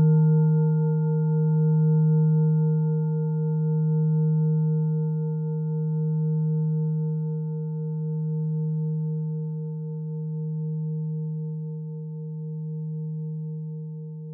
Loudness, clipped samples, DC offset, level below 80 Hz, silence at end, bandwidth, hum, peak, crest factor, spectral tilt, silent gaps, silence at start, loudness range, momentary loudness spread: -25 LUFS; under 0.1%; under 0.1%; -80 dBFS; 0 s; 1.5 kHz; none; -12 dBFS; 12 dB; -17 dB/octave; none; 0 s; 9 LU; 12 LU